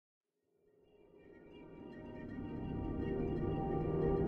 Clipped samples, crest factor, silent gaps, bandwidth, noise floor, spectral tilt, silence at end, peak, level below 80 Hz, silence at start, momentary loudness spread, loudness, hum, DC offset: under 0.1%; 18 dB; none; 4.4 kHz; -77 dBFS; -11 dB/octave; 0 s; -24 dBFS; -50 dBFS; 1.05 s; 20 LU; -40 LUFS; none; under 0.1%